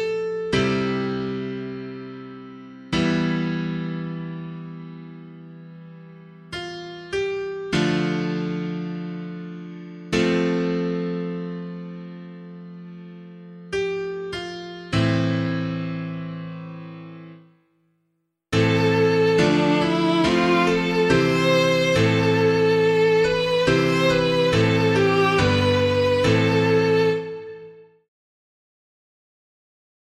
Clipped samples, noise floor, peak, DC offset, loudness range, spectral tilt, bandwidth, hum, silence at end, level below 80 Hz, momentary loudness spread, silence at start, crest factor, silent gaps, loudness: under 0.1%; -73 dBFS; -6 dBFS; under 0.1%; 13 LU; -6 dB/octave; 13 kHz; none; 2.3 s; -48 dBFS; 21 LU; 0 s; 18 dB; none; -21 LUFS